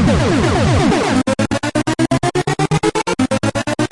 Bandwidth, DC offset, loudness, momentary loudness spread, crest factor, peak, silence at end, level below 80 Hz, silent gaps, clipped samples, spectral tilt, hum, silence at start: 11.5 kHz; under 0.1%; -16 LUFS; 4 LU; 12 dB; -4 dBFS; 0.05 s; -32 dBFS; none; under 0.1%; -5.5 dB/octave; none; 0 s